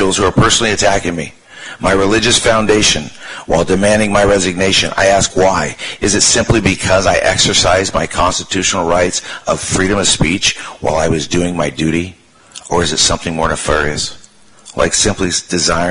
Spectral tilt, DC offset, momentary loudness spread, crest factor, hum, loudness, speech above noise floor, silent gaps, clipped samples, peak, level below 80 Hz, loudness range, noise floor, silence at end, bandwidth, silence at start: -3 dB/octave; under 0.1%; 9 LU; 12 dB; none; -12 LUFS; 28 dB; none; under 0.1%; 0 dBFS; -30 dBFS; 4 LU; -41 dBFS; 0 s; 11 kHz; 0 s